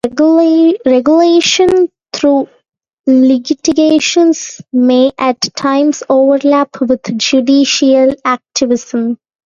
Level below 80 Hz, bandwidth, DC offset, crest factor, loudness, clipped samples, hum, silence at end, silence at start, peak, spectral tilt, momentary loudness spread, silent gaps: -52 dBFS; 7.6 kHz; under 0.1%; 10 dB; -11 LUFS; under 0.1%; none; 0.3 s; 0.05 s; 0 dBFS; -3 dB/octave; 7 LU; 2.93-3.04 s